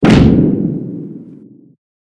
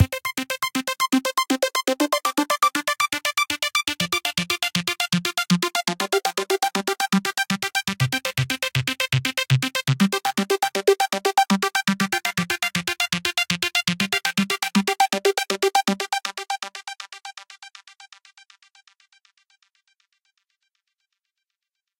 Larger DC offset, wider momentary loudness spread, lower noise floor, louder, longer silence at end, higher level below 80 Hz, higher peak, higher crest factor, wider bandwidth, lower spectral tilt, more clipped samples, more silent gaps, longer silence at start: neither; first, 22 LU vs 6 LU; second, -38 dBFS vs -84 dBFS; first, -12 LUFS vs -22 LUFS; second, 0.85 s vs 3.95 s; first, -30 dBFS vs -56 dBFS; first, 0 dBFS vs -4 dBFS; second, 14 dB vs 20 dB; second, 10.5 kHz vs 17 kHz; first, -8 dB/octave vs -3.5 dB/octave; first, 0.5% vs under 0.1%; neither; about the same, 0 s vs 0 s